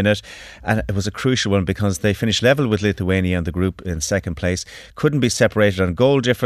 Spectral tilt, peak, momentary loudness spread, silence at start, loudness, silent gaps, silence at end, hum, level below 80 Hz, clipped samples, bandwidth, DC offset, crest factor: -5 dB/octave; -2 dBFS; 8 LU; 0 s; -19 LUFS; none; 0 s; none; -40 dBFS; under 0.1%; 14 kHz; under 0.1%; 16 dB